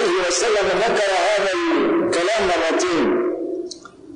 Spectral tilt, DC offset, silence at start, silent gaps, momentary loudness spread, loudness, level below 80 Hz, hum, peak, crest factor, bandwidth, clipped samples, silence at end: -3 dB/octave; under 0.1%; 0 s; none; 9 LU; -19 LUFS; -50 dBFS; none; -10 dBFS; 10 dB; 10.5 kHz; under 0.1%; 0 s